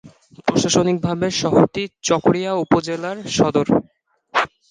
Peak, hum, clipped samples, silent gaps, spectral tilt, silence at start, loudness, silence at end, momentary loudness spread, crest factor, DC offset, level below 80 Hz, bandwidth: -2 dBFS; none; under 0.1%; none; -5 dB/octave; 0.05 s; -19 LUFS; 0.25 s; 7 LU; 18 dB; under 0.1%; -50 dBFS; 10 kHz